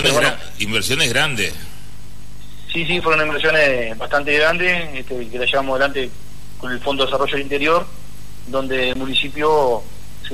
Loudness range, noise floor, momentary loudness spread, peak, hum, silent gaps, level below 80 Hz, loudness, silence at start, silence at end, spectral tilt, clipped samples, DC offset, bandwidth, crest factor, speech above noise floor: 3 LU; -39 dBFS; 13 LU; -4 dBFS; 50 Hz at -40 dBFS; none; -40 dBFS; -18 LUFS; 0 s; 0 s; -3 dB/octave; under 0.1%; 7%; 13.5 kHz; 16 dB; 20 dB